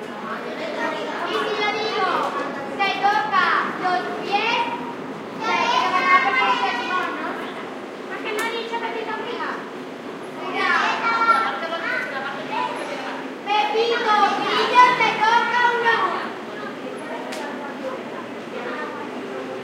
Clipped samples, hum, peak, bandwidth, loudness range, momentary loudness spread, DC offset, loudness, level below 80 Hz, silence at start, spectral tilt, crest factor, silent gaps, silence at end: under 0.1%; none; -2 dBFS; 16 kHz; 9 LU; 14 LU; under 0.1%; -21 LUFS; -74 dBFS; 0 s; -3 dB/octave; 20 dB; none; 0 s